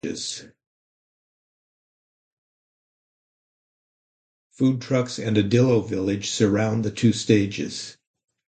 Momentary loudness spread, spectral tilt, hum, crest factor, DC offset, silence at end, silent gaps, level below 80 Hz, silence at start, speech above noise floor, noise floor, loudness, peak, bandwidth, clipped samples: 12 LU; -5.5 dB/octave; none; 20 dB; under 0.1%; 0.6 s; 0.67-4.50 s; -56 dBFS; 0.05 s; over 68 dB; under -90 dBFS; -22 LUFS; -4 dBFS; 9.2 kHz; under 0.1%